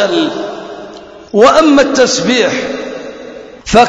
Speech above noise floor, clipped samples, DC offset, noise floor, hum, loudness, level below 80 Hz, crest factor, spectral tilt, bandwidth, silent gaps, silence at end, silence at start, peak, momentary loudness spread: 22 dB; 0.7%; under 0.1%; -31 dBFS; none; -10 LUFS; -40 dBFS; 12 dB; -3.5 dB/octave; 11 kHz; none; 0 s; 0 s; 0 dBFS; 21 LU